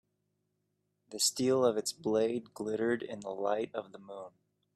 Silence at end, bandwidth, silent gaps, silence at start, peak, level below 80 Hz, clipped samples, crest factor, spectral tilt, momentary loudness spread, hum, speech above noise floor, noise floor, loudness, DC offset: 0.45 s; 15 kHz; none; 1.1 s; -16 dBFS; -78 dBFS; under 0.1%; 20 dB; -3.5 dB/octave; 19 LU; none; 48 dB; -81 dBFS; -32 LUFS; under 0.1%